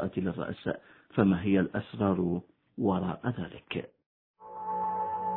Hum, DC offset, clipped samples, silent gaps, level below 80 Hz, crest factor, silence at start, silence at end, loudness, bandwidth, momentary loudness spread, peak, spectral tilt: none; under 0.1%; under 0.1%; 4.06-4.34 s; -60 dBFS; 22 dB; 0 s; 0 s; -31 LUFS; 4.1 kHz; 13 LU; -10 dBFS; -11 dB/octave